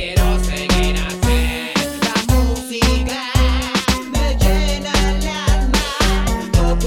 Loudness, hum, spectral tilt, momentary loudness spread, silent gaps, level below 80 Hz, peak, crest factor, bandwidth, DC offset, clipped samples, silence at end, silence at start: -18 LUFS; none; -4.5 dB/octave; 3 LU; none; -18 dBFS; 0 dBFS; 16 dB; 17 kHz; under 0.1%; under 0.1%; 0 s; 0 s